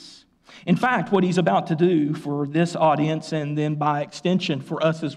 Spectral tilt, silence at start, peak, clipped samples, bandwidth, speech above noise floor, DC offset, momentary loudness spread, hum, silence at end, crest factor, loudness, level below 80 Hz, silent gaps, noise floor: -7 dB/octave; 0 s; -8 dBFS; under 0.1%; 10.5 kHz; 28 dB; under 0.1%; 6 LU; none; 0 s; 14 dB; -22 LUFS; -68 dBFS; none; -49 dBFS